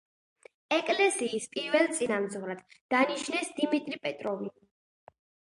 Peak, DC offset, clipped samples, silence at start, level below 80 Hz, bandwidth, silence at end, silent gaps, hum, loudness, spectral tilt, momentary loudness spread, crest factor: -10 dBFS; under 0.1%; under 0.1%; 0.7 s; -80 dBFS; 11.5 kHz; 1 s; 2.81-2.89 s; none; -30 LUFS; -3 dB/octave; 12 LU; 20 dB